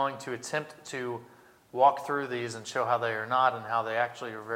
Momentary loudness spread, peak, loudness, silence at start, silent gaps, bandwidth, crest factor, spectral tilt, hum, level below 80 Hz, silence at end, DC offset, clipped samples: 13 LU; -8 dBFS; -30 LUFS; 0 s; none; 16.5 kHz; 22 dB; -4 dB/octave; none; -80 dBFS; 0 s; under 0.1%; under 0.1%